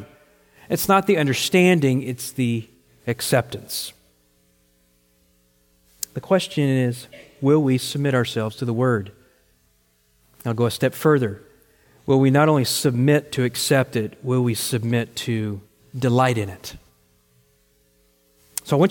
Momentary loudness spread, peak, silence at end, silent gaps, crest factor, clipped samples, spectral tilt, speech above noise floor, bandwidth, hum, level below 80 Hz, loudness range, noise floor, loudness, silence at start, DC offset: 15 LU; -4 dBFS; 0 s; none; 18 dB; under 0.1%; -5.5 dB/octave; 42 dB; 17 kHz; none; -60 dBFS; 7 LU; -62 dBFS; -21 LUFS; 0 s; under 0.1%